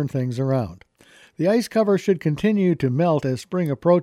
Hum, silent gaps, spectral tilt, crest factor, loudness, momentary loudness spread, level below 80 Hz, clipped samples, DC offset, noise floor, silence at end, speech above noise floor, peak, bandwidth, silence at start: none; none; -7.5 dB/octave; 14 dB; -21 LUFS; 5 LU; -56 dBFS; under 0.1%; under 0.1%; -52 dBFS; 0 s; 32 dB; -6 dBFS; 14.5 kHz; 0 s